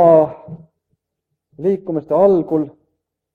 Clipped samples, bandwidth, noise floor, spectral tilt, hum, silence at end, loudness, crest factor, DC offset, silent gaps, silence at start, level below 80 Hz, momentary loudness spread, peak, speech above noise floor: under 0.1%; 4.3 kHz; -77 dBFS; -10.5 dB/octave; none; 0.65 s; -16 LUFS; 16 dB; under 0.1%; none; 0 s; -60 dBFS; 17 LU; 0 dBFS; 62 dB